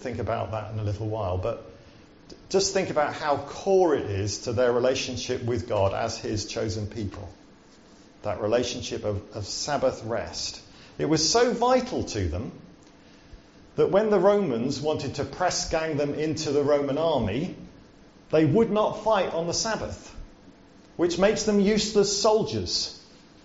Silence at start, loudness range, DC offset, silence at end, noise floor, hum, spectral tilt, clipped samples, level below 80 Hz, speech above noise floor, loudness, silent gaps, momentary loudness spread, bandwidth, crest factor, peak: 0 s; 5 LU; under 0.1%; 0.45 s; -53 dBFS; none; -4.5 dB/octave; under 0.1%; -50 dBFS; 28 dB; -26 LUFS; none; 12 LU; 8 kHz; 18 dB; -8 dBFS